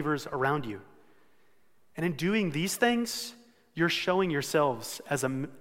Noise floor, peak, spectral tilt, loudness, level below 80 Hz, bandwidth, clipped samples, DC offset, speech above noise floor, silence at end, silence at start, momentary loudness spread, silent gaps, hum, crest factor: -70 dBFS; -10 dBFS; -4.5 dB/octave; -29 LUFS; -62 dBFS; 16.5 kHz; under 0.1%; under 0.1%; 41 dB; 0 s; 0 s; 13 LU; none; none; 20 dB